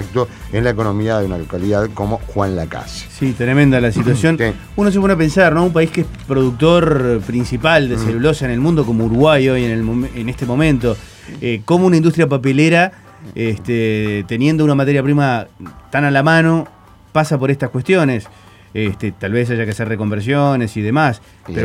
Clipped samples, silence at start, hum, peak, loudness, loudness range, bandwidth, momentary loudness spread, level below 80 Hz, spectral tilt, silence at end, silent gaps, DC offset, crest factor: under 0.1%; 0 s; none; 0 dBFS; -15 LUFS; 4 LU; 15 kHz; 10 LU; -36 dBFS; -7 dB/octave; 0 s; none; under 0.1%; 14 dB